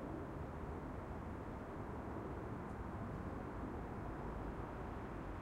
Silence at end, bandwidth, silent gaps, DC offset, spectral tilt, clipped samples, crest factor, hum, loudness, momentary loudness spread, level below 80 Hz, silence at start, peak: 0 s; 16 kHz; none; under 0.1%; -8.5 dB/octave; under 0.1%; 12 dB; none; -48 LUFS; 1 LU; -54 dBFS; 0 s; -34 dBFS